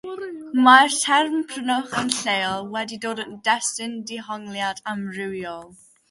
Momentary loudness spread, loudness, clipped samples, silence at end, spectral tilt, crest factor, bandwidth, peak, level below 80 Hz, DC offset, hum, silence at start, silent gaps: 18 LU; -21 LUFS; under 0.1%; 0.35 s; -2 dB/octave; 22 dB; 11.5 kHz; 0 dBFS; -66 dBFS; under 0.1%; none; 0.05 s; none